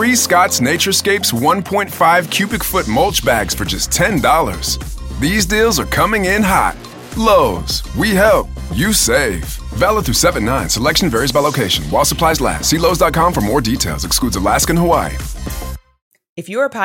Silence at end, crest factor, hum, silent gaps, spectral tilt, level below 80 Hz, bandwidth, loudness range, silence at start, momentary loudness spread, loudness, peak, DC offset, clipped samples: 0 s; 14 dB; none; 16.02-16.11 s, 16.29-16.36 s; -3.5 dB/octave; -28 dBFS; 17 kHz; 1 LU; 0 s; 11 LU; -14 LUFS; 0 dBFS; under 0.1%; under 0.1%